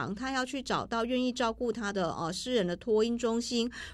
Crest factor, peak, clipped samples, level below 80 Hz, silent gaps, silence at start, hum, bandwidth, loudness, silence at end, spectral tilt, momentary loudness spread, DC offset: 14 dB; -16 dBFS; under 0.1%; -56 dBFS; none; 0 s; none; 13 kHz; -31 LUFS; 0 s; -4.5 dB/octave; 4 LU; under 0.1%